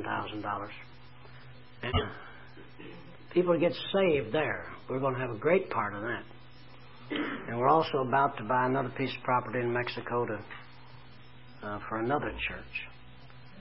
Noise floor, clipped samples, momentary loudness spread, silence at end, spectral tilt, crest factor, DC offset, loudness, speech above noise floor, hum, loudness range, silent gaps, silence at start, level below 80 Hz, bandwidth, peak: -53 dBFS; under 0.1%; 22 LU; 0 s; -4 dB/octave; 20 dB; 0.3%; -31 LUFS; 23 dB; none; 7 LU; none; 0 s; -54 dBFS; 5.6 kHz; -12 dBFS